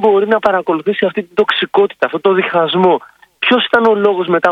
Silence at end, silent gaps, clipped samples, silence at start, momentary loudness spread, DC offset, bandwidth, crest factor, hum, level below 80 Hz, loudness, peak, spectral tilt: 0 s; none; 0.2%; 0 s; 5 LU; under 0.1%; 7 kHz; 12 dB; none; -58 dBFS; -13 LUFS; 0 dBFS; -6.5 dB/octave